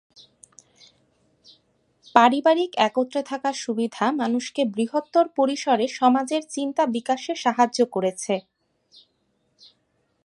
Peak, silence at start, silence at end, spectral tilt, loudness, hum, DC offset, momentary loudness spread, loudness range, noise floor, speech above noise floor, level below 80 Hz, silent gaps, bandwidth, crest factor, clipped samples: 0 dBFS; 2.15 s; 1.85 s; -4 dB/octave; -22 LUFS; none; under 0.1%; 9 LU; 3 LU; -70 dBFS; 48 dB; -78 dBFS; none; 11.5 kHz; 24 dB; under 0.1%